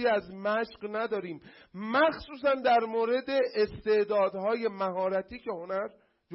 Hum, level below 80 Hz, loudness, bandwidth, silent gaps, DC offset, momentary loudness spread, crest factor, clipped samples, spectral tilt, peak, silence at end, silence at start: none; -62 dBFS; -29 LUFS; 5.8 kHz; none; under 0.1%; 12 LU; 14 dB; under 0.1%; -9 dB/octave; -16 dBFS; 0 s; 0 s